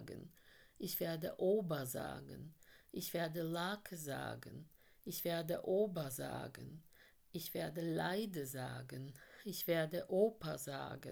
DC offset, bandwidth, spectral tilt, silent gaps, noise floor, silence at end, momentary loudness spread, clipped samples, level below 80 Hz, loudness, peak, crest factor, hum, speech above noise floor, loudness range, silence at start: under 0.1%; over 20 kHz; -5 dB/octave; none; -66 dBFS; 0 s; 17 LU; under 0.1%; -72 dBFS; -42 LUFS; -22 dBFS; 20 dB; none; 24 dB; 4 LU; 0 s